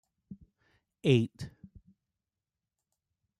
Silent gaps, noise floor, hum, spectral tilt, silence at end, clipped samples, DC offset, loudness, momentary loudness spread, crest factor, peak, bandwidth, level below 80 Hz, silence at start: none; under -90 dBFS; none; -7.5 dB/octave; 1.9 s; under 0.1%; under 0.1%; -29 LUFS; 26 LU; 24 dB; -12 dBFS; 11.5 kHz; -66 dBFS; 0.3 s